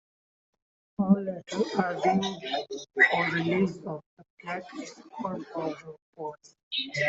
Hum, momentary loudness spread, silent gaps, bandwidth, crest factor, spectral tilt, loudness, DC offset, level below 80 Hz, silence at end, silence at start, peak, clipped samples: none; 19 LU; 4.06-4.17 s, 4.30-4.37 s, 6.02-6.13 s, 6.63-6.71 s; 7.8 kHz; 22 dB; -5.5 dB/octave; -28 LUFS; under 0.1%; -70 dBFS; 0 s; 1 s; -8 dBFS; under 0.1%